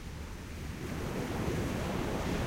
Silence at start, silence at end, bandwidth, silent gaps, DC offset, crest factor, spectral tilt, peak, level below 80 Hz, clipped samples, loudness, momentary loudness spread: 0 s; 0 s; 16 kHz; none; under 0.1%; 14 dB; -6 dB/octave; -22 dBFS; -44 dBFS; under 0.1%; -37 LUFS; 9 LU